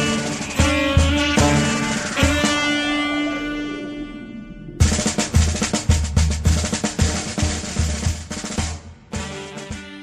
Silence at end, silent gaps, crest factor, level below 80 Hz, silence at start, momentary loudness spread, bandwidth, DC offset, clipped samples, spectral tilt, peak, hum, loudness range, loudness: 0 s; none; 18 dB; -26 dBFS; 0 s; 15 LU; 14 kHz; under 0.1%; under 0.1%; -4 dB/octave; -2 dBFS; none; 5 LU; -20 LUFS